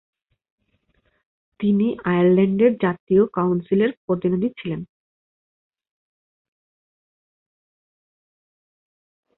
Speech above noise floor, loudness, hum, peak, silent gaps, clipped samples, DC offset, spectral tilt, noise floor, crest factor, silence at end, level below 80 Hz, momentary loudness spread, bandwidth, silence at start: 48 dB; -20 LUFS; none; -6 dBFS; 3.00-3.07 s, 3.97-4.08 s; under 0.1%; under 0.1%; -12.5 dB/octave; -67 dBFS; 18 dB; 4.55 s; -60 dBFS; 9 LU; 4.1 kHz; 1.6 s